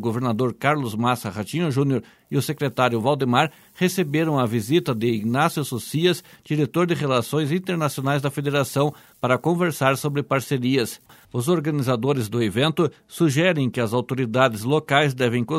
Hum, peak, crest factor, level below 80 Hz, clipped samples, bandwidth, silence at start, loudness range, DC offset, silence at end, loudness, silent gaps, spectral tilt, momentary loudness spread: none; -2 dBFS; 20 dB; -62 dBFS; under 0.1%; 16 kHz; 0 s; 1 LU; under 0.1%; 0 s; -22 LUFS; none; -6 dB/octave; 6 LU